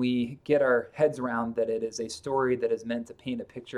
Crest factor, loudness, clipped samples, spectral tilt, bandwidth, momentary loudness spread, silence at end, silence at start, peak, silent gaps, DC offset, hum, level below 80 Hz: 16 dB; -29 LUFS; under 0.1%; -5.5 dB/octave; 11.5 kHz; 11 LU; 0 s; 0 s; -12 dBFS; none; under 0.1%; none; -64 dBFS